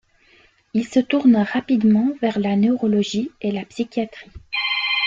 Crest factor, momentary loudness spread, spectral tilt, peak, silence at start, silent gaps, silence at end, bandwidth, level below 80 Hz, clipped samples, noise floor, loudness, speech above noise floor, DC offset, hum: 14 dB; 10 LU; -5.5 dB/octave; -6 dBFS; 0.75 s; none; 0 s; 7.6 kHz; -56 dBFS; under 0.1%; -55 dBFS; -20 LUFS; 36 dB; under 0.1%; none